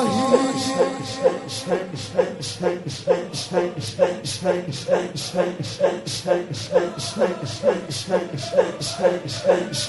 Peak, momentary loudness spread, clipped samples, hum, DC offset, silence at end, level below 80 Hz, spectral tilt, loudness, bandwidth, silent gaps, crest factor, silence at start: -2 dBFS; 5 LU; under 0.1%; none; under 0.1%; 0 s; -56 dBFS; -4.5 dB/octave; -23 LUFS; 11.5 kHz; none; 20 dB; 0 s